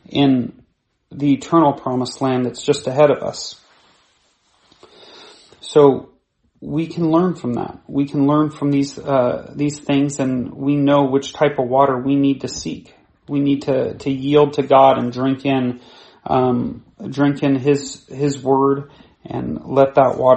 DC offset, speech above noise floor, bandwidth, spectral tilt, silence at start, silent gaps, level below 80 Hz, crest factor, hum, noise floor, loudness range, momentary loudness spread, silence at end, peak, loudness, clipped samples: under 0.1%; 44 dB; 8.8 kHz; -6.5 dB/octave; 0.1 s; none; -54 dBFS; 18 dB; none; -61 dBFS; 4 LU; 12 LU; 0 s; 0 dBFS; -18 LUFS; under 0.1%